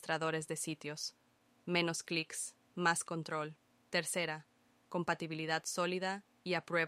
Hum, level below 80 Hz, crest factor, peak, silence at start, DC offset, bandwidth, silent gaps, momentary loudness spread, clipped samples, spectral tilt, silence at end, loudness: none; -82 dBFS; 22 dB; -18 dBFS; 0 s; under 0.1%; 15.5 kHz; none; 9 LU; under 0.1%; -3.5 dB/octave; 0 s; -38 LUFS